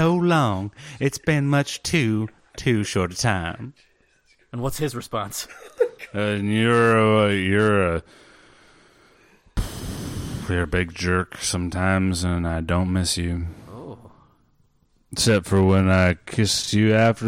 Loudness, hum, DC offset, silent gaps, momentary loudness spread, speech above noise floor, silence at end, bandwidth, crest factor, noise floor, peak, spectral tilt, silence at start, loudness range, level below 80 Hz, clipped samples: -22 LUFS; none; under 0.1%; none; 14 LU; 41 dB; 0 s; 16 kHz; 16 dB; -62 dBFS; -6 dBFS; -5 dB/octave; 0 s; 7 LU; -42 dBFS; under 0.1%